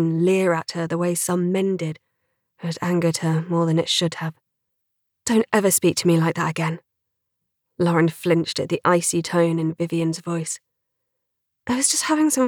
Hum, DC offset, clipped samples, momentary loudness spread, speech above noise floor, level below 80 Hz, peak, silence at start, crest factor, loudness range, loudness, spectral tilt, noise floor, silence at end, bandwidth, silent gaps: none; under 0.1%; under 0.1%; 12 LU; 58 dB; -66 dBFS; -4 dBFS; 0 s; 18 dB; 2 LU; -21 LUFS; -4.5 dB/octave; -78 dBFS; 0 s; 18 kHz; none